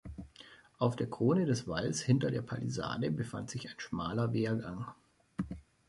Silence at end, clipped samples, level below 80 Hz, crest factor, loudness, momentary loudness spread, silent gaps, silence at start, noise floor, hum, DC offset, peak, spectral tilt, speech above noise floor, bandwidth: 0.3 s; under 0.1%; -58 dBFS; 20 dB; -35 LUFS; 16 LU; none; 0.05 s; -58 dBFS; none; under 0.1%; -16 dBFS; -6 dB/octave; 24 dB; 11.5 kHz